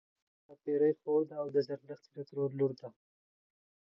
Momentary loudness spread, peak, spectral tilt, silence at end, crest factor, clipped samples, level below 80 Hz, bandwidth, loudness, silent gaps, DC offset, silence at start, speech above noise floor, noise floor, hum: 17 LU; -20 dBFS; -9.5 dB/octave; 1.1 s; 16 dB; under 0.1%; -90 dBFS; 6 kHz; -34 LUFS; none; under 0.1%; 0.5 s; over 56 dB; under -90 dBFS; none